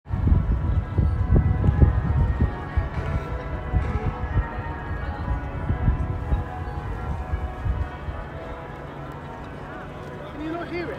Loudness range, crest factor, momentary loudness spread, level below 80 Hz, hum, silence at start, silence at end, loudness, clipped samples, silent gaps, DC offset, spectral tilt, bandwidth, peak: 9 LU; 22 dB; 15 LU; -28 dBFS; none; 0.05 s; 0 s; -27 LUFS; under 0.1%; none; under 0.1%; -9 dB/octave; 5.4 kHz; -2 dBFS